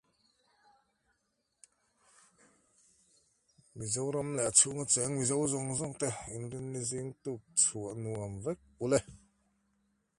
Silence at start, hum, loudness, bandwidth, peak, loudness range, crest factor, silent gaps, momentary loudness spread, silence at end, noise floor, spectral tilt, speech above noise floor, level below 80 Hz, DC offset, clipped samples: 3.75 s; none; -32 LUFS; 11.5 kHz; -10 dBFS; 8 LU; 26 dB; none; 15 LU; 1 s; -80 dBFS; -3.5 dB/octave; 47 dB; -64 dBFS; under 0.1%; under 0.1%